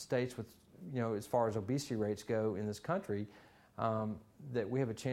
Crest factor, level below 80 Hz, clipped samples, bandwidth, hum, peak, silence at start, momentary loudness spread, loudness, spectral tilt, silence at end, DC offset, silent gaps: 18 dB; -70 dBFS; under 0.1%; 16 kHz; none; -20 dBFS; 0 s; 14 LU; -38 LUFS; -6.5 dB/octave; 0 s; under 0.1%; none